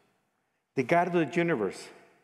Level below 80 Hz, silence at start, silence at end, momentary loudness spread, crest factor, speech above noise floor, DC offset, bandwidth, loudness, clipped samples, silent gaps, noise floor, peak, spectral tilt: -76 dBFS; 0.75 s; 0.3 s; 11 LU; 20 dB; 50 dB; under 0.1%; 12 kHz; -28 LUFS; under 0.1%; none; -77 dBFS; -10 dBFS; -6.5 dB/octave